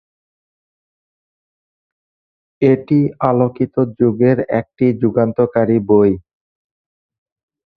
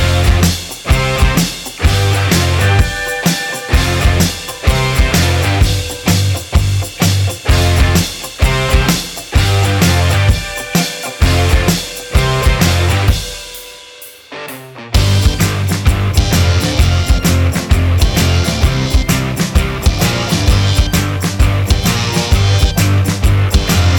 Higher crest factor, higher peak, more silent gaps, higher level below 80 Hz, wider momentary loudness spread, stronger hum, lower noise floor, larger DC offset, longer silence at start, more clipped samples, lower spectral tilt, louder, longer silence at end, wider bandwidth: first, 18 dB vs 12 dB; about the same, 0 dBFS vs 0 dBFS; neither; second, -52 dBFS vs -18 dBFS; about the same, 5 LU vs 6 LU; neither; first, under -90 dBFS vs -35 dBFS; neither; first, 2.6 s vs 0 s; neither; first, -11.5 dB/octave vs -4.5 dB/octave; about the same, -15 LUFS vs -13 LUFS; first, 1.6 s vs 0 s; second, 4.9 kHz vs over 20 kHz